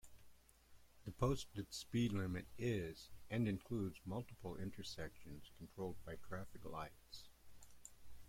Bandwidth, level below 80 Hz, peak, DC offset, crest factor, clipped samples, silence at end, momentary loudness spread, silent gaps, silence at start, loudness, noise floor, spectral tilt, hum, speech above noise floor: 16.5 kHz; -62 dBFS; -24 dBFS; under 0.1%; 22 dB; under 0.1%; 0 s; 17 LU; none; 0.05 s; -46 LUFS; -66 dBFS; -6 dB/octave; none; 21 dB